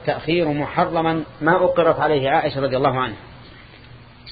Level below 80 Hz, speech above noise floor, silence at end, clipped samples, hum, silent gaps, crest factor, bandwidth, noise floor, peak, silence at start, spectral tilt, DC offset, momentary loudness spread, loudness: -48 dBFS; 24 dB; 0 s; under 0.1%; none; none; 18 dB; 5 kHz; -43 dBFS; -2 dBFS; 0 s; -11 dB/octave; under 0.1%; 6 LU; -19 LUFS